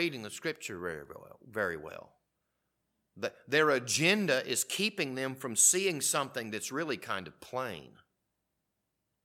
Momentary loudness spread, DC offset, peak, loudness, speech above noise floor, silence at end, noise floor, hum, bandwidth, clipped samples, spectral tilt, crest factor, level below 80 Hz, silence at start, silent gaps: 17 LU; under 0.1%; -12 dBFS; -31 LUFS; 51 dB; 1.35 s; -83 dBFS; none; 17 kHz; under 0.1%; -2 dB/octave; 22 dB; -74 dBFS; 0 s; none